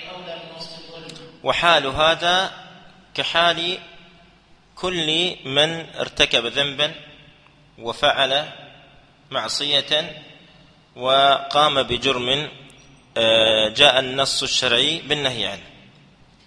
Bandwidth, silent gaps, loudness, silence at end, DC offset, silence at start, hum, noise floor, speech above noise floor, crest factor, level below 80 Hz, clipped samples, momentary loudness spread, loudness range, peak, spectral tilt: 11 kHz; none; -19 LUFS; 0.8 s; under 0.1%; 0 s; none; -53 dBFS; 33 dB; 22 dB; -52 dBFS; under 0.1%; 18 LU; 5 LU; 0 dBFS; -2.5 dB/octave